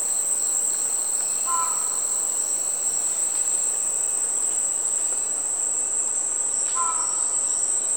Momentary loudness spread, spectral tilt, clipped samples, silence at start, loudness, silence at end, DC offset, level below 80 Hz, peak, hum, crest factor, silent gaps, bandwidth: 1 LU; 1.5 dB/octave; under 0.1%; 0 s; -21 LUFS; 0 s; 0.3%; -68 dBFS; -10 dBFS; none; 14 dB; none; over 20 kHz